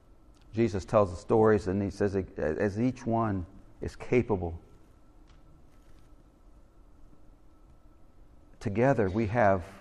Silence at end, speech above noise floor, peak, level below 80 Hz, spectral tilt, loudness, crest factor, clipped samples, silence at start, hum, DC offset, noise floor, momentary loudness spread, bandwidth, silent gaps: 0 s; 28 dB; -10 dBFS; -52 dBFS; -8 dB/octave; -28 LUFS; 20 dB; under 0.1%; 0.55 s; none; under 0.1%; -56 dBFS; 14 LU; 11 kHz; none